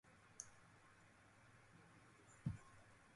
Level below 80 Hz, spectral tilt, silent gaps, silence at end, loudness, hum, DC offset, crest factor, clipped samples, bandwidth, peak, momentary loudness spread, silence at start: -72 dBFS; -5 dB/octave; none; 0 s; -59 LUFS; none; under 0.1%; 26 dB; under 0.1%; 11.5 kHz; -32 dBFS; 17 LU; 0.05 s